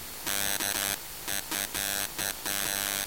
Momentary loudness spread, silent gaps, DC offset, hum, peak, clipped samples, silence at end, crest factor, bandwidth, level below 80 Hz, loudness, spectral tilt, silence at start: 4 LU; none; 0.2%; none; -12 dBFS; under 0.1%; 0 s; 20 dB; 17 kHz; -56 dBFS; -29 LUFS; -0.5 dB/octave; 0 s